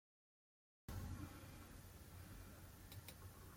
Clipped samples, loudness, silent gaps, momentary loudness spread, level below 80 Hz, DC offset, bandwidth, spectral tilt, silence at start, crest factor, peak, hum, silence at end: under 0.1%; -57 LUFS; none; 7 LU; -64 dBFS; under 0.1%; 16.5 kHz; -5 dB/octave; 0.9 s; 18 dB; -38 dBFS; none; 0 s